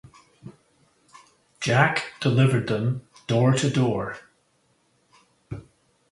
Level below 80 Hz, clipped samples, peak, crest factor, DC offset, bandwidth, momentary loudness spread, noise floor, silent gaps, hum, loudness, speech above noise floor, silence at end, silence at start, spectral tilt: -58 dBFS; under 0.1%; -2 dBFS; 22 dB; under 0.1%; 11.5 kHz; 20 LU; -66 dBFS; none; none; -23 LUFS; 45 dB; 0.5 s; 0.45 s; -6 dB/octave